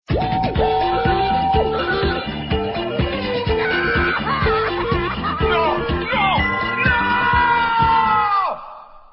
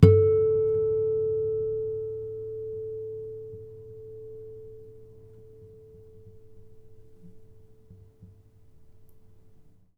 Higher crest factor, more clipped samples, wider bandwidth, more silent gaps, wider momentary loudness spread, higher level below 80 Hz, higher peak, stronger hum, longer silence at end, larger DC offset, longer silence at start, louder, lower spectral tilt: second, 14 dB vs 28 dB; neither; first, 5.8 kHz vs 5.2 kHz; neither; second, 6 LU vs 28 LU; first, -30 dBFS vs -50 dBFS; second, -4 dBFS vs 0 dBFS; neither; second, 0.15 s vs 0.85 s; neither; about the same, 0.1 s vs 0 s; first, -18 LUFS vs -27 LUFS; about the same, -9.5 dB/octave vs -10.5 dB/octave